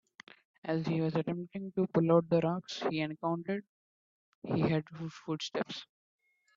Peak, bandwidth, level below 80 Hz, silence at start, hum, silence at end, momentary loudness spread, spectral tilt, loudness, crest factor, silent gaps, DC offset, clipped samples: -14 dBFS; 7.4 kHz; -72 dBFS; 0.65 s; none; 0.75 s; 13 LU; -7 dB/octave; -33 LUFS; 20 dB; 3.69-4.42 s; under 0.1%; under 0.1%